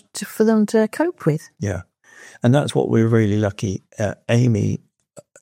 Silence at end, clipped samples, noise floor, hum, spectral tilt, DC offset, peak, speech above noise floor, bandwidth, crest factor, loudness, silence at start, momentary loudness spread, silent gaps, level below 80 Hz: 0.2 s; under 0.1%; -48 dBFS; none; -7 dB/octave; under 0.1%; -2 dBFS; 29 dB; 16 kHz; 18 dB; -20 LUFS; 0.15 s; 10 LU; none; -60 dBFS